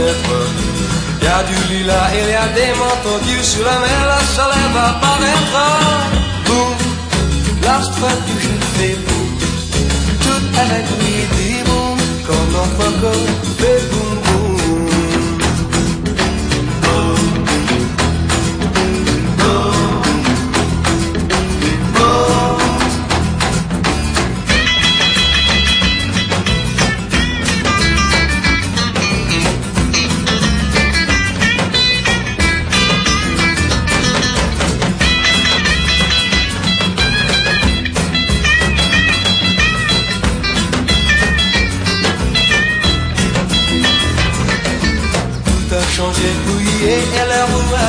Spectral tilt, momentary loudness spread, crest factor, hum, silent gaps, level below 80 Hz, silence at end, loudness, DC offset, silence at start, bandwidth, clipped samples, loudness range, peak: -4 dB/octave; 5 LU; 14 dB; none; none; -22 dBFS; 0 s; -13 LUFS; under 0.1%; 0 s; 13.5 kHz; under 0.1%; 3 LU; 0 dBFS